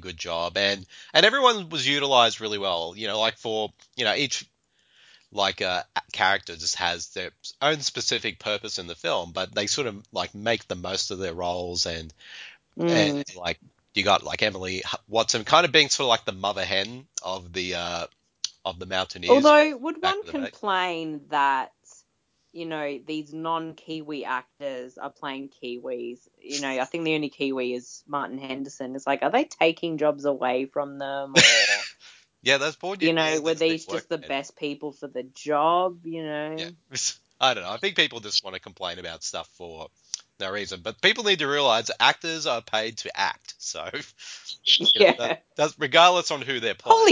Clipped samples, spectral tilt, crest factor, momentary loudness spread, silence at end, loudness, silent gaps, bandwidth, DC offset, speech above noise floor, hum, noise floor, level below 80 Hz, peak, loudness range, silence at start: under 0.1%; -2.5 dB/octave; 24 dB; 16 LU; 0 s; -24 LUFS; none; 7.8 kHz; under 0.1%; 47 dB; none; -72 dBFS; -58 dBFS; -2 dBFS; 9 LU; 0 s